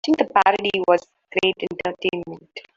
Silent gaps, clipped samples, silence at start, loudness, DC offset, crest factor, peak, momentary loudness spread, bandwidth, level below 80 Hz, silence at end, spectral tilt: none; under 0.1%; 0.05 s; -21 LUFS; under 0.1%; 18 dB; -2 dBFS; 13 LU; 7.8 kHz; -62 dBFS; 0.15 s; -4.5 dB/octave